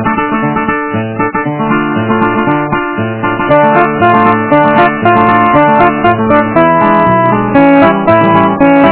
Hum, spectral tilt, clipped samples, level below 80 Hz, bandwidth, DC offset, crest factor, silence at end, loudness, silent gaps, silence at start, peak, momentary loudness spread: none; -10.5 dB/octave; 1%; -38 dBFS; 4 kHz; under 0.1%; 8 dB; 0 s; -9 LUFS; none; 0 s; 0 dBFS; 7 LU